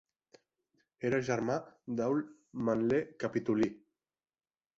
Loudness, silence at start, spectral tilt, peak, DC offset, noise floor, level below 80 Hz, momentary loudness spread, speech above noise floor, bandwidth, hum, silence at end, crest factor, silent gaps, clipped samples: -34 LUFS; 1 s; -7 dB/octave; -18 dBFS; under 0.1%; under -90 dBFS; -68 dBFS; 7 LU; over 57 dB; 7.8 kHz; none; 1 s; 18 dB; none; under 0.1%